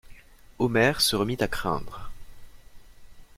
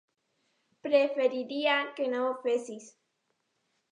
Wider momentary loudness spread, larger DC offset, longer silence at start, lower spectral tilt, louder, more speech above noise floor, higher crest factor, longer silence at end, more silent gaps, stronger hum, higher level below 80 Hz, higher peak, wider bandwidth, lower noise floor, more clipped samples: first, 22 LU vs 14 LU; neither; second, 0.05 s vs 0.85 s; about the same, -4 dB/octave vs -3 dB/octave; first, -25 LUFS vs -29 LUFS; second, 23 dB vs 49 dB; about the same, 20 dB vs 20 dB; second, 0.05 s vs 1.05 s; neither; neither; first, -46 dBFS vs under -90 dBFS; first, -8 dBFS vs -12 dBFS; first, 16.5 kHz vs 10 kHz; second, -48 dBFS vs -78 dBFS; neither